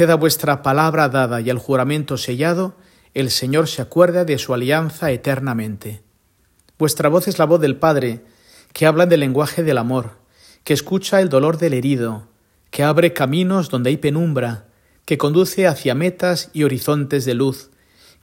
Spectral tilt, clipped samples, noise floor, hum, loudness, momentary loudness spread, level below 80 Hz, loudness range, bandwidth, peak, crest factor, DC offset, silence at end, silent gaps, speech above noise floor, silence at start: -5.5 dB/octave; under 0.1%; -60 dBFS; none; -18 LUFS; 10 LU; -56 dBFS; 2 LU; 16.5 kHz; 0 dBFS; 18 dB; under 0.1%; 0.6 s; none; 43 dB; 0 s